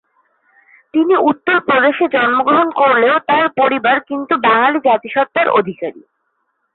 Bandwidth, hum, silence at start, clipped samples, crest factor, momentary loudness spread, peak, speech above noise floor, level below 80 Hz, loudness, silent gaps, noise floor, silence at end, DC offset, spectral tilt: 4.3 kHz; none; 0.95 s; under 0.1%; 12 dB; 6 LU; -2 dBFS; 54 dB; -62 dBFS; -13 LUFS; none; -67 dBFS; 0.75 s; under 0.1%; -9.5 dB/octave